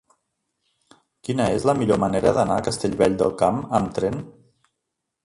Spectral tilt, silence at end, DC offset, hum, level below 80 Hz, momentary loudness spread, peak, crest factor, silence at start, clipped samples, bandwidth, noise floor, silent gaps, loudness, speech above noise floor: -6 dB/octave; 0.95 s; under 0.1%; none; -48 dBFS; 8 LU; -4 dBFS; 20 dB; 1.3 s; under 0.1%; 11.5 kHz; -80 dBFS; none; -21 LUFS; 60 dB